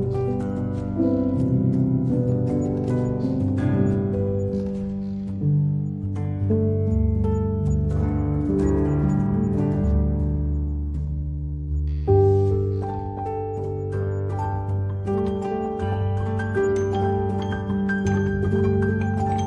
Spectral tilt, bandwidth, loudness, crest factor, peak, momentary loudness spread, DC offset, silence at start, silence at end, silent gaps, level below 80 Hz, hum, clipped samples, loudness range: -9.5 dB/octave; 7.4 kHz; -23 LUFS; 16 dB; -6 dBFS; 7 LU; under 0.1%; 0 s; 0 s; none; -34 dBFS; none; under 0.1%; 3 LU